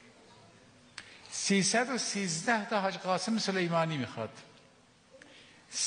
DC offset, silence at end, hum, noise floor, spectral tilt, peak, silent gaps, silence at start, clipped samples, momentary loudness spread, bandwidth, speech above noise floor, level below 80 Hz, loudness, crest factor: under 0.1%; 0 s; none; -62 dBFS; -3.5 dB/octave; -14 dBFS; none; 0.3 s; under 0.1%; 20 LU; 10 kHz; 31 dB; -78 dBFS; -31 LUFS; 20 dB